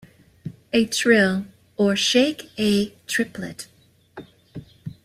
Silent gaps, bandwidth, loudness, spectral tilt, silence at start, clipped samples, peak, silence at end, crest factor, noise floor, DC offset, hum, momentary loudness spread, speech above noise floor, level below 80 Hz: none; 16 kHz; -21 LUFS; -4 dB/octave; 0.45 s; under 0.1%; -4 dBFS; 0.15 s; 20 dB; -44 dBFS; under 0.1%; none; 22 LU; 23 dB; -58 dBFS